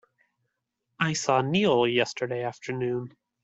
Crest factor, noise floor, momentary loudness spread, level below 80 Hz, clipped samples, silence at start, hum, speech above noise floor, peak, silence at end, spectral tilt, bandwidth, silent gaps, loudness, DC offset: 20 dB; -81 dBFS; 10 LU; -68 dBFS; under 0.1%; 1 s; none; 55 dB; -8 dBFS; 0.35 s; -4.5 dB/octave; 8.2 kHz; none; -26 LUFS; under 0.1%